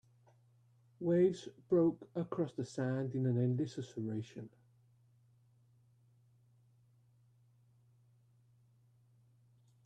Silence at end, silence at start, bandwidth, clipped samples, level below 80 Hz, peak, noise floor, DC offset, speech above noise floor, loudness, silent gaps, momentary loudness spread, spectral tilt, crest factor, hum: 5.4 s; 1 s; 9.6 kHz; under 0.1%; -78 dBFS; -20 dBFS; -69 dBFS; under 0.1%; 34 dB; -36 LUFS; none; 13 LU; -8.5 dB/octave; 20 dB; none